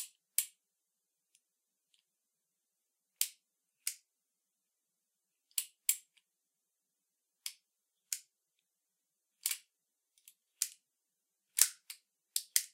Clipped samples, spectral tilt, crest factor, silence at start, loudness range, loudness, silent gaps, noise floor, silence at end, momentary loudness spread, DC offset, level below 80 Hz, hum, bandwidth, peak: under 0.1%; 5.5 dB/octave; 38 dB; 0 s; 9 LU; -37 LUFS; none; -87 dBFS; 0.05 s; 17 LU; under 0.1%; under -90 dBFS; none; 16 kHz; -4 dBFS